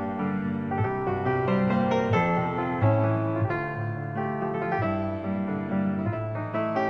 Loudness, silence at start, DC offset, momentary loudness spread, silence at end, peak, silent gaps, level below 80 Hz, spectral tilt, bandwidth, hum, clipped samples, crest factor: -27 LUFS; 0 s; 0.1%; 6 LU; 0 s; -12 dBFS; none; -54 dBFS; -9 dB/octave; 6.4 kHz; none; under 0.1%; 14 dB